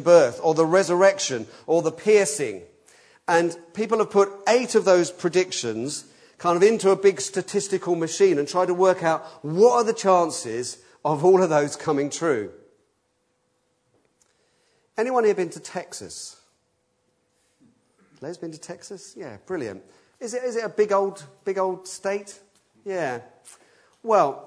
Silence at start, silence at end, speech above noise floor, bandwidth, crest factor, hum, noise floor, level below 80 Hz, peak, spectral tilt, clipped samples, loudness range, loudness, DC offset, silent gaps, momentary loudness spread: 0 s; 0 s; 49 dB; 11 kHz; 20 dB; none; -71 dBFS; -74 dBFS; -2 dBFS; -4.5 dB/octave; under 0.1%; 14 LU; -22 LUFS; under 0.1%; none; 18 LU